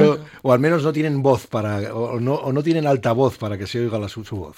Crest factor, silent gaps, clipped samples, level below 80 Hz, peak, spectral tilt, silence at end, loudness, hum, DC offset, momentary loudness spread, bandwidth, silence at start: 16 dB; none; under 0.1%; -54 dBFS; -4 dBFS; -7.5 dB/octave; 0.05 s; -20 LUFS; none; under 0.1%; 8 LU; 16 kHz; 0 s